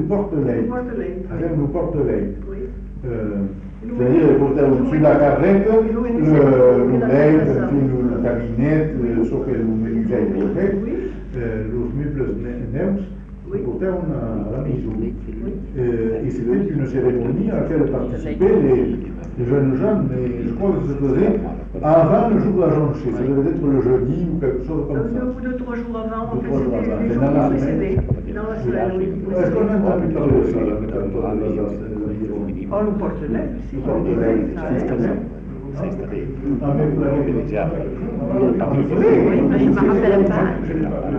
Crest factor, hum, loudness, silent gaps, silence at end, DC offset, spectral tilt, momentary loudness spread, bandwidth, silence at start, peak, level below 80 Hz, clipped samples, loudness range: 14 dB; none; -19 LUFS; none; 0 s; under 0.1%; -10.5 dB/octave; 11 LU; 7 kHz; 0 s; -4 dBFS; -32 dBFS; under 0.1%; 8 LU